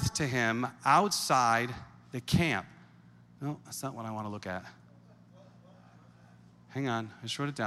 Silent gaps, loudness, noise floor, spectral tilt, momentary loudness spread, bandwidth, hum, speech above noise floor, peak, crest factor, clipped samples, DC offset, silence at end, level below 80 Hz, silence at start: none; -31 LUFS; -57 dBFS; -4 dB/octave; 16 LU; 15.5 kHz; none; 26 dB; -10 dBFS; 22 dB; under 0.1%; under 0.1%; 0 s; -58 dBFS; 0 s